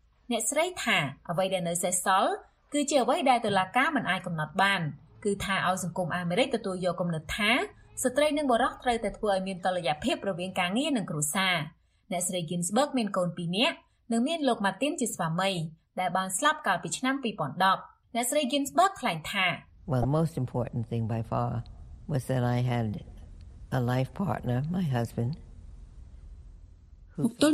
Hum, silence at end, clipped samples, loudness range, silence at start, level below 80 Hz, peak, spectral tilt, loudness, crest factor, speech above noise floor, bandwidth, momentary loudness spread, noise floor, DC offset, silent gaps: none; 0 s; under 0.1%; 5 LU; 0.3 s; -54 dBFS; -10 dBFS; -4.5 dB/octave; -28 LUFS; 18 dB; 24 dB; 15.5 kHz; 8 LU; -52 dBFS; under 0.1%; none